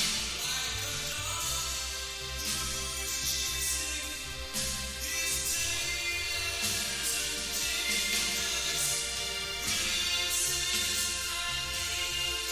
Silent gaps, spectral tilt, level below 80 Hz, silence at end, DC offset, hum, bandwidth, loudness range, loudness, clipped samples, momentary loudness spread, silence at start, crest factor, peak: none; 0 dB/octave; -48 dBFS; 0 s; under 0.1%; none; 16 kHz; 3 LU; -30 LUFS; under 0.1%; 5 LU; 0 s; 18 dB; -14 dBFS